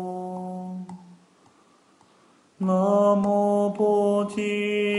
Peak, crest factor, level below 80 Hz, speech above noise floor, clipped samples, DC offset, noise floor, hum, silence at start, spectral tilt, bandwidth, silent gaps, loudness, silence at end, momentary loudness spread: -10 dBFS; 16 dB; -72 dBFS; 37 dB; under 0.1%; under 0.1%; -59 dBFS; none; 0 s; -7 dB/octave; 11 kHz; none; -23 LUFS; 0 s; 16 LU